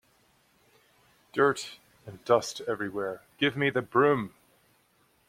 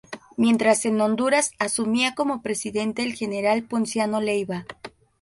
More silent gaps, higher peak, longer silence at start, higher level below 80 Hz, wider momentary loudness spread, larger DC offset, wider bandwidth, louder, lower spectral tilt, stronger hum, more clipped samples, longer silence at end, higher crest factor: neither; about the same, -8 dBFS vs -6 dBFS; first, 1.35 s vs 0.1 s; second, -70 dBFS vs -64 dBFS; first, 18 LU vs 12 LU; neither; first, 16 kHz vs 11.5 kHz; second, -28 LUFS vs -23 LUFS; first, -5 dB/octave vs -3.5 dB/octave; neither; neither; first, 1 s vs 0.35 s; about the same, 22 dB vs 18 dB